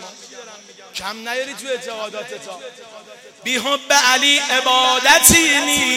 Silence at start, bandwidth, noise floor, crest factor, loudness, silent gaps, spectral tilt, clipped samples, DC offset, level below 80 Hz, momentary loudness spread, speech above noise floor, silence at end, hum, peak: 0 s; 16.5 kHz; -38 dBFS; 18 dB; -14 LUFS; none; -0.5 dB/octave; under 0.1%; under 0.1%; -46 dBFS; 23 LU; 20 dB; 0 s; none; 0 dBFS